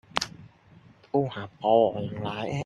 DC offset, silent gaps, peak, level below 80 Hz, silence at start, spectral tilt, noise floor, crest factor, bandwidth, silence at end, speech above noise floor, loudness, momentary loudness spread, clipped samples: under 0.1%; none; -2 dBFS; -62 dBFS; 0.15 s; -5.5 dB/octave; -55 dBFS; 26 dB; 12 kHz; 0 s; 29 dB; -27 LUFS; 11 LU; under 0.1%